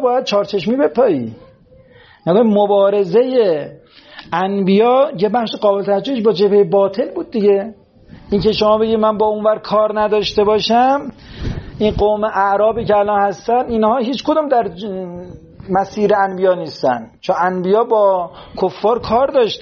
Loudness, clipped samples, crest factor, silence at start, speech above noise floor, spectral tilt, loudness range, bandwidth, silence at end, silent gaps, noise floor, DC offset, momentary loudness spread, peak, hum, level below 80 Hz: -15 LUFS; under 0.1%; 12 dB; 0 s; 31 dB; -4.5 dB/octave; 3 LU; 7 kHz; 0 s; none; -46 dBFS; under 0.1%; 10 LU; -2 dBFS; none; -42 dBFS